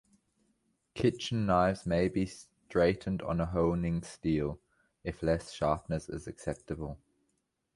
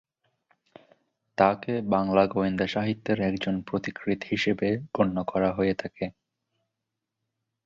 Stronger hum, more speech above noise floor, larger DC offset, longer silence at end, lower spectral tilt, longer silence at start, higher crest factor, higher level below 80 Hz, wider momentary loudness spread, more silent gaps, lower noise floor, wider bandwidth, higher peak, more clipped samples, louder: neither; second, 48 dB vs 59 dB; neither; second, 0.8 s vs 1.55 s; about the same, -6.5 dB/octave vs -7 dB/octave; second, 0.95 s vs 1.4 s; about the same, 20 dB vs 22 dB; first, -50 dBFS vs -56 dBFS; first, 14 LU vs 8 LU; neither; second, -80 dBFS vs -85 dBFS; first, 11.5 kHz vs 7.4 kHz; second, -14 dBFS vs -6 dBFS; neither; second, -32 LUFS vs -27 LUFS